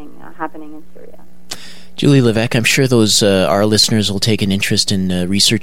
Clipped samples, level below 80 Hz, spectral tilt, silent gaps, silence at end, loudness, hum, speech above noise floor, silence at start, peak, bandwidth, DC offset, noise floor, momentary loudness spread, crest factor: under 0.1%; -48 dBFS; -4 dB/octave; none; 0.05 s; -13 LUFS; none; 19 dB; 0 s; 0 dBFS; 16.5 kHz; 5%; -33 dBFS; 18 LU; 16 dB